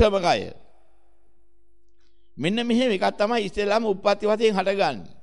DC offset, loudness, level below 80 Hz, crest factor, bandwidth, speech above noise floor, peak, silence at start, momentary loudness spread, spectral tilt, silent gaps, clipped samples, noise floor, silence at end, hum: 1%; -23 LUFS; -52 dBFS; 18 dB; 11.5 kHz; 43 dB; -6 dBFS; 0 s; 5 LU; -5 dB/octave; none; under 0.1%; -66 dBFS; 0.15 s; none